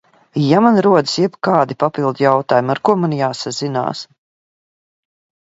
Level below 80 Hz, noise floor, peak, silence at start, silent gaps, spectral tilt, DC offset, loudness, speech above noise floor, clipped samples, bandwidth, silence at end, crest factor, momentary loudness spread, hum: -62 dBFS; under -90 dBFS; 0 dBFS; 0.35 s; none; -6 dB/octave; under 0.1%; -16 LUFS; over 75 dB; under 0.1%; 8 kHz; 1.4 s; 16 dB; 10 LU; none